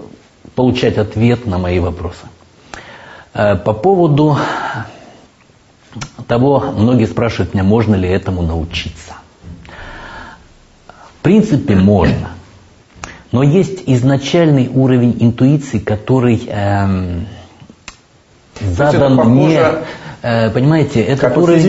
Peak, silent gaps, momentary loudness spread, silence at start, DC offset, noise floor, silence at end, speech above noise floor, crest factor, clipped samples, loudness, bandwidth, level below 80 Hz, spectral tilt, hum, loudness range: 0 dBFS; none; 20 LU; 0 s; under 0.1%; -47 dBFS; 0 s; 36 dB; 14 dB; under 0.1%; -13 LUFS; 8 kHz; -36 dBFS; -7.5 dB/octave; none; 5 LU